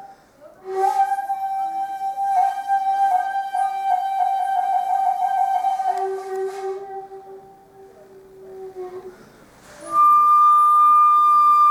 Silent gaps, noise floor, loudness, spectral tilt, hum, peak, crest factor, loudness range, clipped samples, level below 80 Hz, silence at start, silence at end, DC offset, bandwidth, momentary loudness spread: none; -48 dBFS; -18 LUFS; -3 dB/octave; none; -8 dBFS; 10 dB; 16 LU; under 0.1%; -68 dBFS; 0 s; 0 s; under 0.1%; 14.5 kHz; 22 LU